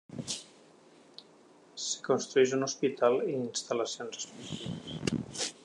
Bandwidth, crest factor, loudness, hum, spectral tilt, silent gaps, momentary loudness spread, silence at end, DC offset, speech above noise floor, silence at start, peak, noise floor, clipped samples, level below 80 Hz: 11 kHz; 20 dB; -32 LUFS; none; -3.5 dB/octave; none; 17 LU; 0.1 s; under 0.1%; 28 dB; 0.1 s; -12 dBFS; -59 dBFS; under 0.1%; -68 dBFS